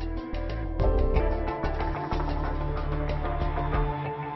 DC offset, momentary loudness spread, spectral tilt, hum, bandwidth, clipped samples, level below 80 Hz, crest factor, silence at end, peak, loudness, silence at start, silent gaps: 0.1%; 7 LU; -9 dB/octave; none; 6 kHz; under 0.1%; -30 dBFS; 16 dB; 0 s; -12 dBFS; -30 LUFS; 0 s; none